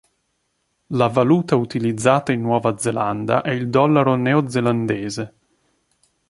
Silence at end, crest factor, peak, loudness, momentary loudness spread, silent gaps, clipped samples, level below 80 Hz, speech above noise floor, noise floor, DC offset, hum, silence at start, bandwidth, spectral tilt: 1 s; 18 dB; -2 dBFS; -19 LUFS; 8 LU; none; under 0.1%; -58 dBFS; 52 dB; -70 dBFS; under 0.1%; none; 0.9 s; 11.5 kHz; -6.5 dB/octave